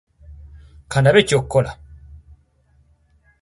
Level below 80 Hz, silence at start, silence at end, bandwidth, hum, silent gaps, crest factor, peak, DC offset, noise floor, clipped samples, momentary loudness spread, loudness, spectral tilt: -44 dBFS; 0.3 s; 1.45 s; 11.5 kHz; none; none; 20 dB; -2 dBFS; under 0.1%; -58 dBFS; under 0.1%; 14 LU; -17 LUFS; -5.5 dB/octave